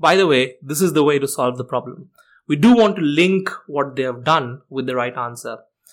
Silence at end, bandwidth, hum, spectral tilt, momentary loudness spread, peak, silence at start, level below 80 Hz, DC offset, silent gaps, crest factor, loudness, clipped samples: 0.35 s; 17 kHz; none; -5 dB/octave; 14 LU; -4 dBFS; 0 s; -60 dBFS; under 0.1%; none; 14 dB; -18 LUFS; under 0.1%